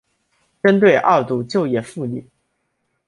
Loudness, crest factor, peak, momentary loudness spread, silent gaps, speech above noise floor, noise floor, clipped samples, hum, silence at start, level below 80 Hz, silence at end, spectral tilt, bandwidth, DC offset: -17 LUFS; 18 dB; -2 dBFS; 14 LU; none; 55 dB; -71 dBFS; under 0.1%; none; 0.65 s; -62 dBFS; 0.85 s; -7 dB/octave; 11.5 kHz; under 0.1%